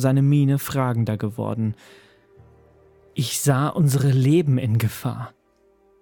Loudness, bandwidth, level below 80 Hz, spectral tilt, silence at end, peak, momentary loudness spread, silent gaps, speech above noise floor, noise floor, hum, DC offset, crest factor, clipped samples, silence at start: -21 LUFS; 19 kHz; -58 dBFS; -6.5 dB/octave; 0.75 s; -6 dBFS; 12 LU; none; 40 dB; -60 dBFS; none; under 0.1%; 16 dB; under 0.1%; 0 s